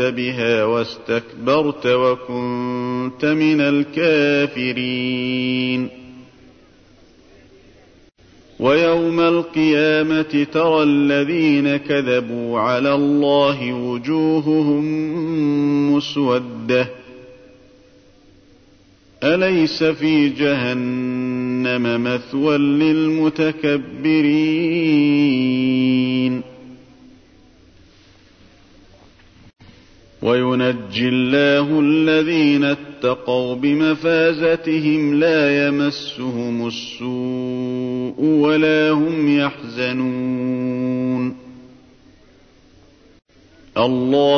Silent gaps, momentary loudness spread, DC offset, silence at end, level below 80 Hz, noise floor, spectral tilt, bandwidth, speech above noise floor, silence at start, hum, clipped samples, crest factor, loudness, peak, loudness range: none; 8 LU; under 0.1%; 0 s; -58 dBFS; -51 dBFS; -7 dB/octave; 6.6 kHz; 33 dB; 0 s; none; under 0.1%; 16 dB; -18 LUFS; -4 dBFS; 8 LU